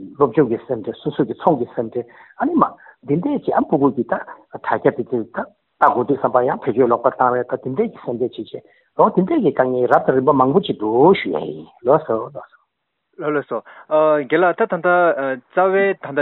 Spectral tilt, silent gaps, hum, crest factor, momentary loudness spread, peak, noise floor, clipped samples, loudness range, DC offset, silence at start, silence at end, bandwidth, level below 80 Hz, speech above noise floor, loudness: -5.5 dB/octave; none; none; 18 dB; 13 LU; 0 dBFS; -73 dBFS; under 0.1%; 4 LU; under 0.1%; 0 s; 0 s; 4.2 kHz; -60 dBFS; 56 dB; -18 LUFS